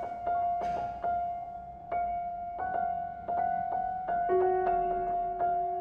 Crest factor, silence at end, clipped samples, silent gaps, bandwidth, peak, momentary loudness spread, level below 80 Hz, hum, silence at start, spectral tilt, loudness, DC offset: 14 dB; 0 s; under 0.1%; none; 5.2 kHz; -18 dBFS; 9 LU; -56 dBFS; none; 0 s; -8 dB/octave; -32 LUFS; under 0.1%